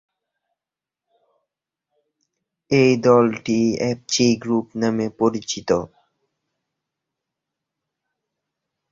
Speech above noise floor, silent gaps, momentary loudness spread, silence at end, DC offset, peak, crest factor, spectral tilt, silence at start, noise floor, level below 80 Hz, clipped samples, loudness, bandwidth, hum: 70 dB; none; 8 LU; 3.05 s; under 0.1%; -2 dBFS; 20 dB; -5 dB/octave; 2.7 s; -89 dBFS; -58 dBFS; under 0.1%; -19 LUFS; 7.8 kHz; none